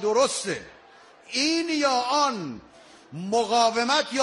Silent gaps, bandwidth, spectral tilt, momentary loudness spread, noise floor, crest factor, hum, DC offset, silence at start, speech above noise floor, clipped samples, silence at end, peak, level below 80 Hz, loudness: none; 11.5 kHz; -2.5 dB/octave; 15 LU; -52 dBFS; 16 dB; none; under 0.1%; 0 s; 28 dB; under 0.1%; 0 s; -8 dBFS; -66 dBFS; -24 LUFS